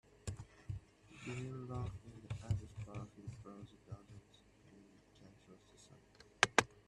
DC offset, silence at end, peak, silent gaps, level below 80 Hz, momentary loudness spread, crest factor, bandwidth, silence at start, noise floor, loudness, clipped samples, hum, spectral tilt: under 0.1%; 0.05 s; -6 dBFS; none; -62 dBFS; 28 LU; 38 dB; 13 kHz; 0.25 s; -66 dBFS; -42 LUFS; under 0.1%; none; -3.5 dB/octave